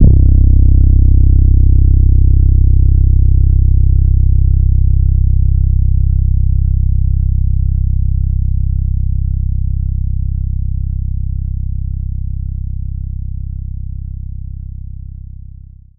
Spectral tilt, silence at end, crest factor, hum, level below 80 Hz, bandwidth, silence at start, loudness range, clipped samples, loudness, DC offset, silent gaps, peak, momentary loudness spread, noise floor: -20 dB/octave; 1.2 s; 10 dB; none; -12 dBFS; 0.7 kHz; 0 s; 12 LU; 0.9%; -14 LUFS; under 0.1%; none; 0 dBFS; 15 LU; -34 dBFS